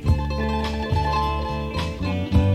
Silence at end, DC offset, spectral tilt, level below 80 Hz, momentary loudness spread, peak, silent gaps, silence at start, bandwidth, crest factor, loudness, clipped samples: 0 s; under 0.1%; -7 dB/octave; -28 dBFS; 5 LU; -6 dBFS; none; 0 s; 12.5 kHz; 16 dB; -24 LUFS; under 0.1%